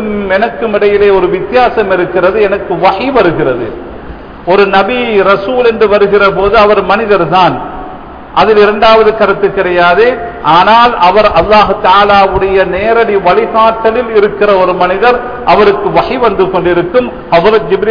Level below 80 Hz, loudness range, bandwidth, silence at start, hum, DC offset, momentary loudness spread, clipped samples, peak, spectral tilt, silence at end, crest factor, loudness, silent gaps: -32 dBFS; 3 LU; 5.4 kHz; 0 s; none; under 0.1%; 7 LU; 0.8%; 0 dBFS; -7 dB/octave; 0 s; 8 dB; -8 LUFS; none